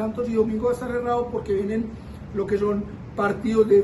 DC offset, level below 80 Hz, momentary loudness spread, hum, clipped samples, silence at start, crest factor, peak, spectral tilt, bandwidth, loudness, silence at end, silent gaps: under 0.1%; -44 dBFS; 9 LU; none; under 0.1%; 0 s; 16 dB; -8 dBFS; -7.5 dB/octave; 12 kHz; -25 LUFS; 0 s; none